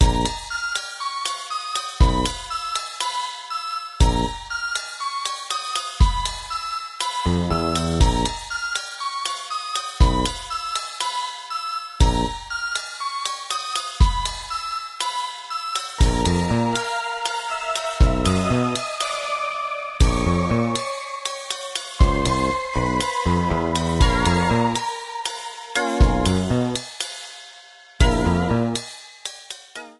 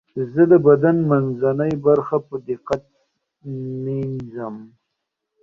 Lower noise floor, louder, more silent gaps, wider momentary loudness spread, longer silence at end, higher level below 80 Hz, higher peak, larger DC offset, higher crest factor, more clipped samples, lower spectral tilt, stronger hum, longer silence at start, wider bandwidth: second, -46 dBFS vs -79 dBFS; second, -23 LUFS vs -19 LUFS; neither; second, 9 LU vs 17 LU; second, 0.05 s vs 0.75 s; first, -26 dBFS vs -58 dBFS; about the same, -2 dBFS vs -2 dBFS; neither; about the same, 20 dB vs 18 dB; neither; second, -4.5 dB/octave vs -10 dB/octave; neither; second, 0 s vs 0.15 s; first, 12 kHz vs 6.8 kHz